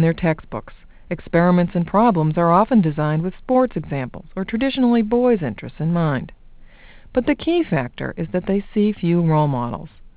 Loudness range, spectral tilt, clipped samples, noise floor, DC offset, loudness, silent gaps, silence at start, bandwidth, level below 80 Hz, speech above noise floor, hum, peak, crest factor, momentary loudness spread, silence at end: 4 LU; -12 dB/octave; under 0.1%; -43 dBFS; under 0.1%; -19 LUFS; none; 0 s; 4 kHz; -44 dBFS; 24 dB; none; -4 dBFS; 16 dB; 12 LU; 0.1 s